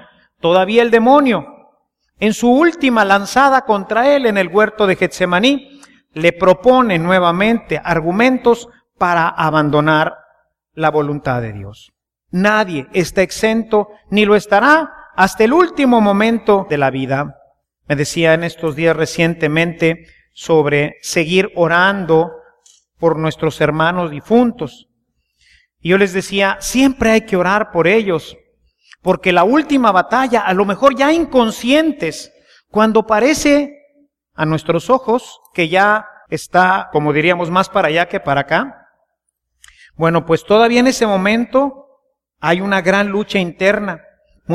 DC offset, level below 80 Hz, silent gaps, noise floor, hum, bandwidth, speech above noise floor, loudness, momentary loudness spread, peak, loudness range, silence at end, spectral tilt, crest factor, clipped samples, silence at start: under 0.1%; -46 dBFS; none; -72 dBFS; none; 15 kHz; 58 dB; -14 LUFS; 8 LU; 0 dBFS; 4 LU; 0 s; -5.5 dB/octave; 14 dB; under 0.1%; 0.45 s